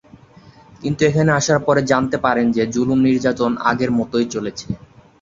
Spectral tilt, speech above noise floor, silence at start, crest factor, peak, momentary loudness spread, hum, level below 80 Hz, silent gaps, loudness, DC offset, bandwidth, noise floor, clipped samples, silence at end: -5.5 dB/octave; 29 dB; 0.45 s; 18 dB; 0 dBFS; 11 LU; none; -48 dBFS; none; -18 LUFS; under 0.1%; 7.8 kHz; -46 dBFS; under 0.1%; 0.45 s